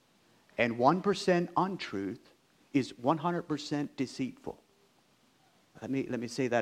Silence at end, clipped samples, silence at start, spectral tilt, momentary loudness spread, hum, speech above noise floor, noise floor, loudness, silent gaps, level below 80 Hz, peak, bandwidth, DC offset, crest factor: 0 s; under 0.1%; 0.6 s; -6 dB/octave; 16 LU; none; 36 dB; -67 dBFS; -32 LUFS; none; -72 dBFS; -12 dBFS; 13 kHz; under 0.1%; 22 dB